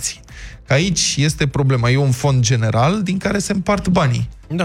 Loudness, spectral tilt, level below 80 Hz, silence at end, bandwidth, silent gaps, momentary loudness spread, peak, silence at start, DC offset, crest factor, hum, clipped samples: -17 LUFS; -5 dB/octave; -38 dBFS; 0 s; 14.5 kHz; none; 9 LU; -2 dBFS; 0 s; under 0.1%; 16 dB; none; under 0.1%